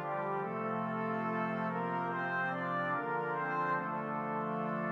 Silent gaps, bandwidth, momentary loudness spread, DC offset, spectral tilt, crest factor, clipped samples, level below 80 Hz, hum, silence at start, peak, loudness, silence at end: none; 6.8 kHz; 2 LU; under 0.1%; -8.5 dB/octave; 12 dB; under 0.1%; -84 dBFS; none; 0 s; -22 dBFS; -35 LUFS; 0 s